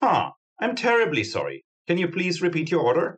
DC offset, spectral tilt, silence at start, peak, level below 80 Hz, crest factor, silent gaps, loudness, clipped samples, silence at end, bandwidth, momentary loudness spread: under 0.1%; -5.5 dB/octave; 0 s; -8 dBFS; -70 dBFS; 16 dB; 0.37-0.56 s, 1.64-1.85 s; -24 LUFS; under 0.1%; 0 s; 8.8 kHz; 10 LU